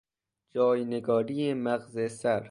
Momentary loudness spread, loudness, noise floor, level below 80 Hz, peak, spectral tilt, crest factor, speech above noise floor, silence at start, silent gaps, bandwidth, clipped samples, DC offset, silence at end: 5 LU; -29 LUFS; -77 dBFS; -72 dBFS; -14 dBFS; -6.5 dB/octave; 16 dB; 49 dB; 0.55 s; none; 11.5 kHz; under 0.1%; under 0.1%; 0 s